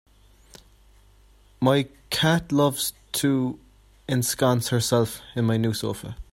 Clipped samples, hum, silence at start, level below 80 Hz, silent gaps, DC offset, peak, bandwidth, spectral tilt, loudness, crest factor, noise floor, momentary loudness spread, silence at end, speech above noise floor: under 0.1%; none; 1.6 s; -52 dBFS; none; under 0.1%; -6 dBFS; 16.5 kHz; -5 dB/octave; -24 LUFS; 20 dB; -55 dBFS; 8 LU; 0.1 s; 32 dB